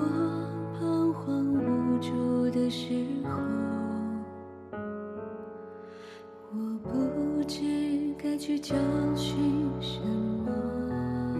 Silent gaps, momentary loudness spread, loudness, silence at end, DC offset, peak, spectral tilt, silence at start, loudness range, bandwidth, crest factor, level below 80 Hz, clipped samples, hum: none; 14 LU; -30 LUFS; 0 s; under 0.1%; -16 dBFS; -7 dB/octave; 0 s; 7 LU; 13.5 kHz; 14 dB; -56 dBFS; under 0.1%; none